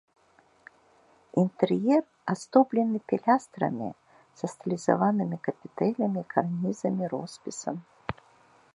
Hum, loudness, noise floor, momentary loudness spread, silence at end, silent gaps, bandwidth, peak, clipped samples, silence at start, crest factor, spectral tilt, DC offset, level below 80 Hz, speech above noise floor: none; -28 LUFS; -63 dBFS; 13 LU; 0.6 s; none; 11 kHz; -6 dBFS; under 0.1%; 1.35 s; 22 dB; -7 dB/octave; under 0.1%; -66 dBFS; 36 dB